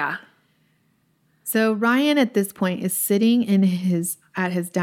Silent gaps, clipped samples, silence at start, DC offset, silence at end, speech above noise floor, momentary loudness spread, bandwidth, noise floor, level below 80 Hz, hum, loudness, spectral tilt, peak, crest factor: none; under 0.1%; 0 s; under 0.1%; 0 s; 44 dB; 9 LU; 17 kHz; -65 dBFS; -74 dBFS; none; -21 LUFS; -5 dB/octave; -8 dBFS; 14 dB